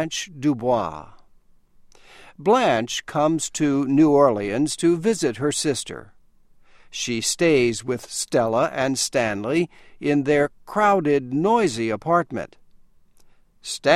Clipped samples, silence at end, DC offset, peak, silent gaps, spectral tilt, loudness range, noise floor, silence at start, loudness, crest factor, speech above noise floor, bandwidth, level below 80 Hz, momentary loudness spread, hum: under 0.1%; 0 s; under 0.1%; -2 dBFS; none; -4.5 dB/octave; 4 LU; -53 dBFS; 0 s; -21 LUFS; 20 dB; 32 dB; 15 kHz; -56 dBFS; 11 LU; none